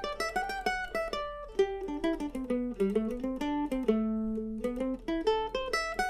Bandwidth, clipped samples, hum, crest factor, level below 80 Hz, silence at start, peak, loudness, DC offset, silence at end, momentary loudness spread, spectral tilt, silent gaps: 15 kHz; under 0.1%; none; 18 dB; -50 dBFS; 0 s; -14 dBFS; -32 LUFS; under 0.1%; 0 s; 5 LU; -5 dB/octave; none